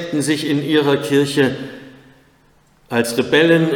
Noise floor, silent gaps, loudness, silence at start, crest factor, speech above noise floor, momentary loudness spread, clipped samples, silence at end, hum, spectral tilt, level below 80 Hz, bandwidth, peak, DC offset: -54 dBFS; none; -16 LUFS; 0 s; 16 dB; 38 dB; 13 LU; under 0.1%; 0 s; none; -5 dB/octave; -60 dBFS; 18.5 kHz; -2 dBFS; under 0.1%